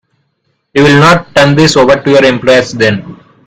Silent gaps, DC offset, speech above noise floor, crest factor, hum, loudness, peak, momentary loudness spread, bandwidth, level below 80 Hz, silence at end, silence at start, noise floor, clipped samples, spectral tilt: none; under 0.1%; 55 dB; 8 dB; none; -7 LUFS; 0 dBFS; 6 LU; 14 kHz; -40 dBFS; 0.3 s; 0.75 s; -61 dBFS; 2%; -5 dB/octave